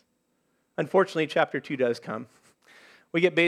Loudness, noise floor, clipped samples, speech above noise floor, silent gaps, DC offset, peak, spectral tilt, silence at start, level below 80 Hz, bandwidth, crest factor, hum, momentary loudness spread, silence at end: -27 LUFS; -73 dBFS; under 0.1%; 48 dB; none; under 0.1%; -6 dBFS; -6 dB/octave; 0.8 s; -82 dBFS; 12 kHz; 22 dB; none; 13 LU; 0 s